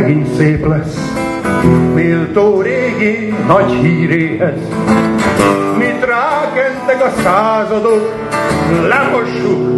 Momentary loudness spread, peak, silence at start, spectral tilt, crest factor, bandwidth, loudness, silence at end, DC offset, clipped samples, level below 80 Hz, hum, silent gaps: 5 LU; 0 dBFS; 0 s; -7 dB/octave; 12 dB; 12.5 kHz; -12 LUFS; 0 s; under 0.1%; under 0.1%; -36 dBFS; none; none